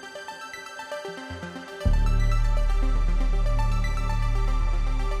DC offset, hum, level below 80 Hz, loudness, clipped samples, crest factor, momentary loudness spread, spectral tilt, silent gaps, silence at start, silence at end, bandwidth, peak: under 0.1%; none; -24 dBFS; -29 LUFS; under 0.1%; 12 dB; 11 LU; -6 dB/octave; none; 0 s; 0 s; 9.4 kHz; -10 dBFS